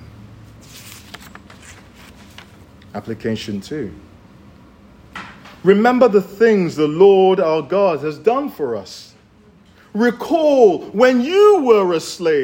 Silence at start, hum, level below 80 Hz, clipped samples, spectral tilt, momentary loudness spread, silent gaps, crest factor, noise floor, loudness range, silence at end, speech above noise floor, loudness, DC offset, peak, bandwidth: 0 s; none; -54 dBFS; under 0.1%; -6 dB/octave; 24 LU; none; 16 dB; -49 dBFS; 15 LU; 0 s; 34 dB; -15 LUFS; under 0.1%; 0 dBFS; 16.5 kHz